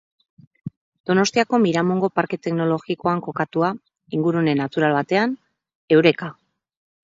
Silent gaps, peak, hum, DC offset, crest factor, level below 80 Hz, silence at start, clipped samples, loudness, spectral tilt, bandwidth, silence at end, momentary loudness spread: 0.77-0.92 s, 1.00-1.04 s, 5.75-5.88 s; -2 dBFS; none; under 0.1%; 20 dB; -64 dBFS; 0.65 s; under 0.1%; -20 LUFS; -6 dB/octave; 7.8 kHz; 0.7 s; 17 LU